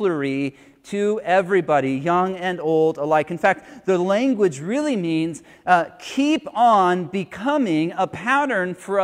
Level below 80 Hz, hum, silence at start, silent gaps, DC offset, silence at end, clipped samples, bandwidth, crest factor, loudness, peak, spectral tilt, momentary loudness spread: -64 dBFS; none; 0 s; none; under 0.1%; 0 s; under 0.1%; 13 kHz; 18 dB; -21 LUFS; -2 dBFS; -6 dB/octave; 7 LU